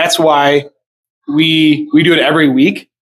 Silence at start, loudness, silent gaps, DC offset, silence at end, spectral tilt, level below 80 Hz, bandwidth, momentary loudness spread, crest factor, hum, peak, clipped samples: 0 s; -10 LUFS; 0.86-1.04 s, 1.10-1.22 s; under 0.1%; 0.35 s; -4.5 dB/octave; -60 dBFS; 14.5 kHz; 6 LU; 12 dB; none; 0 dBFS; under 0.1%